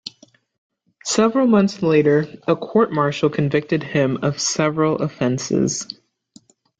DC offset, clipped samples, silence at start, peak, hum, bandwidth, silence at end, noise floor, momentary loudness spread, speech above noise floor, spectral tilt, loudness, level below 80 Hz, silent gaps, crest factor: under 0.1%; under 0.1%; 0.05 s; -4 dBFS; none; 9.4 kHz; 0.85 s; -52 dBFS; 7 LU; 34 dB; -5 dB/octave; -19 LUFS; -58 dBFS; 0.58-0.70 s; 16 dB